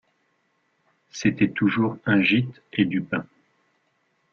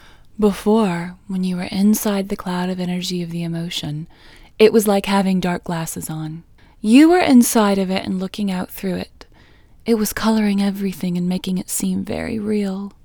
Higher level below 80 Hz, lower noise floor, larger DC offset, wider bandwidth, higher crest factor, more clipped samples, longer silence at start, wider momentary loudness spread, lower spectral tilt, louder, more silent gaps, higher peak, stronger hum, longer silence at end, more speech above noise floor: second, -58 dBFS vs -46 dBFS; first, -70 dBFS vs -48 dBFS; neither; second, 7.2 kHz vs over 20 kHz; about the same, 20 dB vs 18 dB; neither; first, 1.15 s vs 0.4 s; second, 11 LU vs 14 LU; about the same, -6 dB/octave vs -5.5 dB/octave; second, -23 LUFS vs -19 LUFS; neither; second, -6 dBFS vs 0 dBFS; neither; first, 1.1 s vs 0.15 s; first, 47 dB vs 30 dB